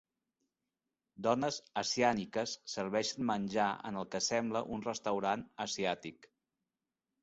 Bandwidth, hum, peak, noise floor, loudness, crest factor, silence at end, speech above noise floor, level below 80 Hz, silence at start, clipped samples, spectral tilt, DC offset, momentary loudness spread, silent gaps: 8 kHz; none; -16 dBFS; under -90 dBFS; -35 LUFS; 22 dB; 0.95 s; over 55 dB; -72 dBFS; 1.2 s; under 0.1%; -3 dB/octave; under 0.1%; 8 LU; none